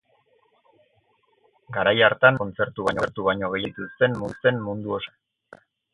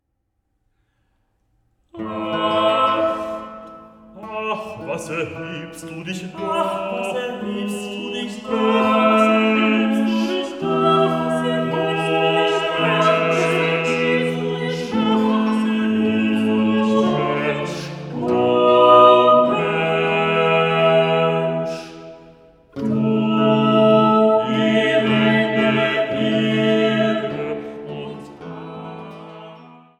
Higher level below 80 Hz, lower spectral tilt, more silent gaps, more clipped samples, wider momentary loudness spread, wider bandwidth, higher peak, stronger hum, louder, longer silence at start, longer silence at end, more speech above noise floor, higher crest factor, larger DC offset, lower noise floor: about the same, -56 dBFS vs -58 dBFS; about the same, -6.5 dB/octave vs -6 dB/octave; neither; neither; second, 13 LU vs 17 LU; about the same, 11 kHz vs 12 kHz; about the same, -2 dBFS vs 0 dBFS; neither; second, -23 LUFS vs -18 LUFS; second, 1.7 s vs 1.95 s; first, 0.85 s vs 0.25 s; second, 43 dB vs 50 dB; first, 24 dB vs 18 dB; neither; second, -65 dBFS vs -72 dBFS